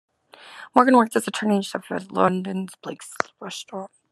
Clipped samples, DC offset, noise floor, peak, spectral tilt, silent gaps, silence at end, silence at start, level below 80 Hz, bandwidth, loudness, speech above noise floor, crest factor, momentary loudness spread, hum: under 0.1%; under 0.1%; -47 dBFS; 0 dBFS; -5 dB/octave; none; 0.25 s; 0.45 s; -72 dBFS; 13 kHz; -22 LUFS; 24 dB; 22 dB; 19 LU; none